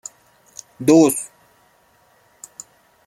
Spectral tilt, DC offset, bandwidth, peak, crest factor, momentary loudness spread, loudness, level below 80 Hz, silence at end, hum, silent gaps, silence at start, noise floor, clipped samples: -5 dB/octave; under 0.1%; 14.5 kHz; -2 dBFS; 20 dB; 27 LU; -16 LUFS; -64 dBFS; 1.8 s; none; none; 0.8 s; -57 dBFS; under 0.1%